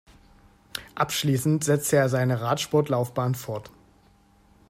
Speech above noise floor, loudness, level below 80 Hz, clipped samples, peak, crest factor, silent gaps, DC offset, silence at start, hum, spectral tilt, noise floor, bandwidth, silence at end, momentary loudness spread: 35 dB; -24 LUFS; -60 dBFS; under 0.1%; -8 dBFS; 18 dB; none; under 0.1%; 0.75 s; none; -5 dB/octave; -58 dBFS; 16 kHz; 1 s; 15 LU